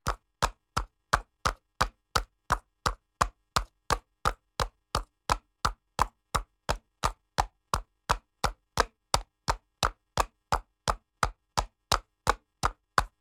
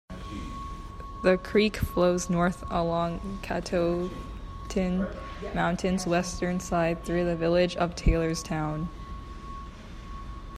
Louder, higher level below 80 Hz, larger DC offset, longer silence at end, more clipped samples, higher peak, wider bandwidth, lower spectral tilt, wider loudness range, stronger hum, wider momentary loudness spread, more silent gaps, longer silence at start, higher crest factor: second, -32 LUFS vs -28 LUFS; about the same, -40 dBFS vs -38 dBFS; neither; first, 0.15 s vs 0 s; neither; first, -4 dBFS vs -10 dBFS; first, 18 kHz vs 14.5 kHz; second, -3 dB/octave vs -6 dB/octave; about the same, 1 LU vs 3 LU; neither; second, 5 LU vs 17 LU; neither; about the same, 0.05 s vs 0.1 s; first, 28 dB vs 18 dB